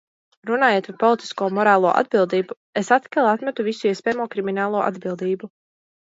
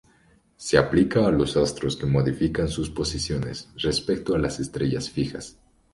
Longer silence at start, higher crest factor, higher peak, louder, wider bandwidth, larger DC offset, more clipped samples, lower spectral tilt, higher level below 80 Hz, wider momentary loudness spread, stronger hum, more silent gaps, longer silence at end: second, 0.45 s vs 0.6 s; about the same, 18 dB vs 22 dB; about the same, -2 dBFS vs -2 dBFS; first, -21 LUFS vs -24 LUFS; second, 7.8 kHz vs 11.5 kHz; neither; neither; about the same, -5.5 dB/octave vs -5.5 dB/octave; second, -72 dBFS vs -42 dBFS; about the same, 10 LU vs 9 LU; neither; first, 2.57-2.73 s vs none; first, 0.65 s vs 0.45 s